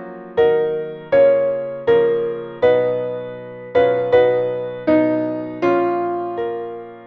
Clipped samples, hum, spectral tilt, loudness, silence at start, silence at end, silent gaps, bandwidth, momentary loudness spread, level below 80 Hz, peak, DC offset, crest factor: under 0.1%; none; -8.5 dB/octave; -18 LUFS; 0 s; 0 s; none; 5.2 kHz; 11 LU; -54 dBFS; -4 dBFS; under 0.1%; 14 dB